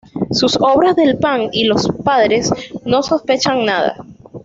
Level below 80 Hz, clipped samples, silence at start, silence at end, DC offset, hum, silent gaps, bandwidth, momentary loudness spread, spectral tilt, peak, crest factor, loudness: -48 dBFS; under 0.1%; 0.15 s; 0.05 s; under 0.1%; none; none; 8 kHz; 7 LU; -4.5 dB/octave; -2 dBFS; 12 dB; -14 LUFS